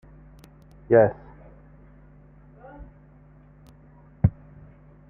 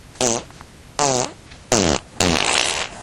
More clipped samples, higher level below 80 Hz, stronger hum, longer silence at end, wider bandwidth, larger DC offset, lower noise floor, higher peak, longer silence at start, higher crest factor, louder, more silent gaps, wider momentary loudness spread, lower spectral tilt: neither; second, -46 dBFS vs -40 dBFS; neither; first, 0.8 s vs 0 s; second, 3.1 kHz vs 17 kHz; neither; first, -51 dBFS vs -42 dBFS; second, -4 dBFS vs 0 dBFS; first, 0.9 s vs 0.05 s; about the same, 24 dB vs 22 dB; second, -22 LUFS vs -19 LUFS; neither; first, 28 LU vs 8 LU; first, -11 dB/octave vs -2.5 dB/octave